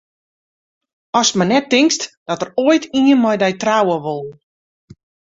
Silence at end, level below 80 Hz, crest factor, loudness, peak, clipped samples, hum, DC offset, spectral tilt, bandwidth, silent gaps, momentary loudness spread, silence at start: 1.05 s; -60 dBFS; 16 dB; -16 LUFS; -2 dBFS; under 0.1%; none; under 0.1%; -4 dB/octave; 8 kHz; 2.17-2.26 s; 11 LU; 1.15 s